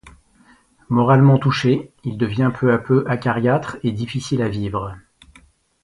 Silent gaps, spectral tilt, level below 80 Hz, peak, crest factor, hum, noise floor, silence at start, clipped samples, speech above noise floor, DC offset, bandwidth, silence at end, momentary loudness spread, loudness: none; -7.5 dB/octave; -48 dBFS; 0 dBFS; 18 dB; none; -54 dBFS; 0.05 s; under 0.1%; 36 dB; under 0.1%; 11 kHz; 0.85 s; 12 LU; -19 LUFS